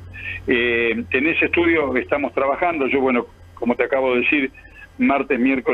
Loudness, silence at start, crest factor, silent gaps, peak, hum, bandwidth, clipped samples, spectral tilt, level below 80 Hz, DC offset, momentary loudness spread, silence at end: -19 LUFS; 0 s; 16 dB; none; -4 dBFS; none; 5 kHz; under 0.1%; -7 dB/octave; -48 dBFS; under 0.1%; 7 LU; 0 s